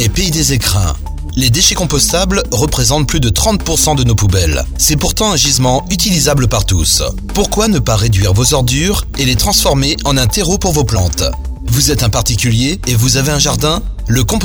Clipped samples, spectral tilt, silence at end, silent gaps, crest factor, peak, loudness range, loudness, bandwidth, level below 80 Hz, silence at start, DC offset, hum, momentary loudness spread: under 0.1%; -3.5 dB/octave; 0 s; none; 12 dB; 0 dBFS; 1 LU; -12 LUFS; over 20 kHz; -20 dBFS; 0 s; under 0.1%; none; 5 LU